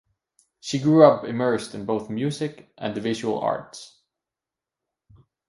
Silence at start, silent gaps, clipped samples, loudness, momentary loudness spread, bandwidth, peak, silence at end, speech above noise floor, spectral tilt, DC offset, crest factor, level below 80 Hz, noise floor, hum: 0.65 s; none; under 0.1%; -23 LUFS; 17 LU; 11.5 kHz; 0 dBFS; 1.65 s; 66 dB; -6.5 dB/octave; under 0.1%; 24 dB; -64 dBFS; -89 dBFS; none